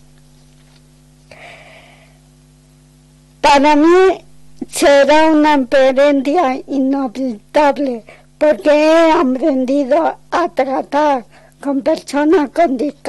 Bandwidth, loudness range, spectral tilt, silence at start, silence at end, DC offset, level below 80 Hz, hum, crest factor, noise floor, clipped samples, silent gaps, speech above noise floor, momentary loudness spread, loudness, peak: 12 kHz; 4 LU; -3.5 dB/octave; 1.4 s; 0 s; under 0.1%; -46 dBFS; none; 10 dB; -46 dBFS; under 0.1%; none; 34 dB; 11 LU; -13 LUFS; -4 dBFS